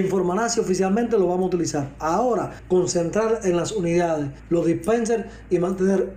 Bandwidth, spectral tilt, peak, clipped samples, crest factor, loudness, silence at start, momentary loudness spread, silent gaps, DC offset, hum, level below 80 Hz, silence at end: 15 kHz; -5.5 dB/octave; -8 dBFS; under 0.1%; 14 dB; -22 LUFS; 0 s; 5 LU; none; under 0.1%; none; -46 dBFS; 0 s